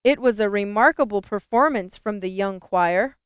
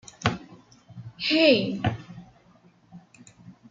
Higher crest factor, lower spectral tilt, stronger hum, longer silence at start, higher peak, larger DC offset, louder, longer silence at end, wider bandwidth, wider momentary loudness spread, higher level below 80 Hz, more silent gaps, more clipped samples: about the same, 18 dB vs 22 dB; first, -9.5 dB/octave vs -5.5 dB/octave; neither; second, 0.05 s vs 0.2 s; about the same, -4 dBFS vs -6 dBFS; neither; about the same, -21 LUFS vs -23 LUFS; about the same, 0.15 s vs 0.2 s; second, 4 kHz vs 7.8 kHz; second, 9 LU vs 26 LU; about the same, -56 dBFS vs -58 dBFS; neither; neither